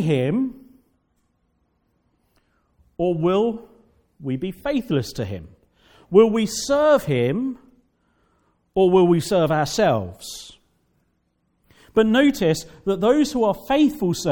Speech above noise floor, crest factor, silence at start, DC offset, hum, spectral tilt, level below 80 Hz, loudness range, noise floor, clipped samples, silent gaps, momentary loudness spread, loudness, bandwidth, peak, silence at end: 49 dB; 20 dB; 0 s; under 0.1%; none; -6 dB/octave; -52 dBFS; 7 LU; -69 dBFS; under 0.1%; none; 14 LU; -20 LUFS; 18 kHz; -2 dBFS; 0 s